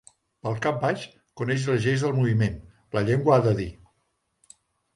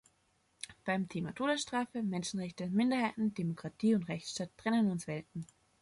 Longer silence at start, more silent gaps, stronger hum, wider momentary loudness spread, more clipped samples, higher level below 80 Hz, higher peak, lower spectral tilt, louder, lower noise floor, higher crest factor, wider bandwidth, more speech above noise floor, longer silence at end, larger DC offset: second, 0.45 s vs 0.65 s; neither; neither; first, 14 LU vs 11 LU; neither; first, -52 dBFS vs -72 dBFS; first, -6 dBFS vs -18 dBFS; first, -7 dB/octave vs -5.5 dB/octave; first, -25 LUFS vs -35 LUFS; about the same, -74 dBFS vs -74 dBFS; about the same, 20 dB vs 16 dB; about the same, 11.5 kHz vs 11.5 kHz; first, 50 dB vs 40 dB; first, 1.25 s vs 0.35 s; neither